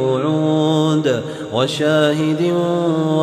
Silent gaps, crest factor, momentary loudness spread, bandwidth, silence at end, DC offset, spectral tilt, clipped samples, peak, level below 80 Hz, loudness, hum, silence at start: none; 12 dB; 5 LU; 13 kHz; 0 s; under 0.1%; -6.5 dB/octave; under 0.1%; -4 dBFS; -60 dBFS; -17 LUFS; none; 0 s